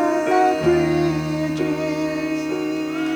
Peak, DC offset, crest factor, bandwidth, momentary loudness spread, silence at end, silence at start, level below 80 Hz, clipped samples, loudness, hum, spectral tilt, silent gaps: -6 dBFS; under 0.1%; 14 dB; over 20 kHz; 7 LU; 0 s; 0 s; -46 dBFS; under 0.1%; -21 LUFS; none; -6.5 dB/octave; none